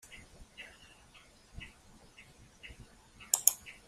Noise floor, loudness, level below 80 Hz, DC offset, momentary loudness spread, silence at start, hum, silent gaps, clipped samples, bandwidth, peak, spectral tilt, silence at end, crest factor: -60 dBFS; -28 LUFS; -60 dBFS; under 0.1%; 28 LU; 0.05 s; none; none; under 0.1%; 15.5 kHz; -4 dBFS; 0.5 dB/octave; 0.15 s; 38 dB